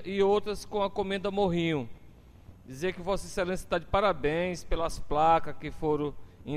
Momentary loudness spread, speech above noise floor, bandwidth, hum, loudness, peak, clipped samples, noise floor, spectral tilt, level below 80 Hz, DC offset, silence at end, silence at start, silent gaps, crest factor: 9 LU; 23 dB; 14.5 kHz; none; -30 LUFS; -14 dBFS; under 0.1%; -52 dBFS; -5.5 dB/octave; -44 dBFS; under 0.1%; 0 s; 0 s; none; 16 dB